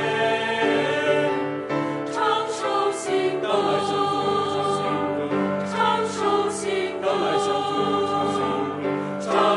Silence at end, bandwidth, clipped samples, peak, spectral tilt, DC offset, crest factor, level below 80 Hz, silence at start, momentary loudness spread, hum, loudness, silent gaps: 0 s; 11.5 kHz; under 0.1%; -6 dBFS; -4.5 dB/octave; under 0.1%; 16 dB; -62 dBFS; 0 s; 4 LU; none; -23 LUFS; none